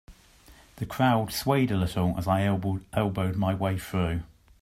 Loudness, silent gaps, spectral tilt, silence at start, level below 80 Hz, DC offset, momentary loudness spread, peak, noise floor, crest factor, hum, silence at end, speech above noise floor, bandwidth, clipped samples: -27 LUFS; none; -6.5 dB/octave; 0.1 s; -50 dBFS; under 0.1%; 6 LU; -8 dBFS; -54 dBFS; 18 dB; none; 0.35 s; 28 dB; 16 kHz; under 0.1%